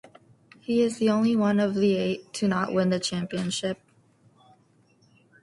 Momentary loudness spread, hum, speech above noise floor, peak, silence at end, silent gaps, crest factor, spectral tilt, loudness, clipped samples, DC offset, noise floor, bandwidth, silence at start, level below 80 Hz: 7 LU; none; 38 dB; -10 dBFS; 1.7 s; none; 16 dB; -5.5 dB/octave; -25 LUFS; under 0.1%; under 0.1%; -62 dBFS; 11.5 kHz; 0.7 s; -64 dBFS